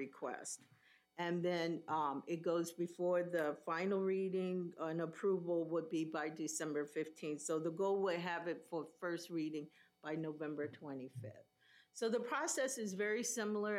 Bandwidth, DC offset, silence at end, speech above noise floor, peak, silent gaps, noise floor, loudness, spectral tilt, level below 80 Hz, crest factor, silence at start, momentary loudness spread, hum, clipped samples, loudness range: 16 kHz; under 0.1%; 0 s; 30 dB; -26 dBFS; none; -70 dBFS; -41 LUFS; -4.5 dB/octave; under -90 dBFS; 16 dB; 0 s; 10 LU; none; under 0.1%; 5 LU